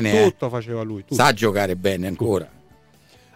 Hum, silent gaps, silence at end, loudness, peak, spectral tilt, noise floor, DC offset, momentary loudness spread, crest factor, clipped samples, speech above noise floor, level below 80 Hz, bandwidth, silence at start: none; none; 0.9 s; -21 LUFS; -4 dBFS; -5 dB/octave; -53 dBFS; under 0.1%; 11 LU; 18 dB; under 0.1%; 33 dB; -54 dBFS; 16 kHz; 0 s